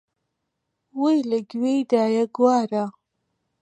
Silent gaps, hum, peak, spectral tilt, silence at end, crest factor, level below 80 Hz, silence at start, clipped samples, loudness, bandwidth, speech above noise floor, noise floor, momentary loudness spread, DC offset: none; none; -6 dBFS; -6 dB/octave; 0.7 s; 18 dB; -78 dBFS; 0.95 s; under 0.1%; -22 LUFS; 9.4 kHz; 58 dB; -78 dBFS; 8 LU; under 0.1%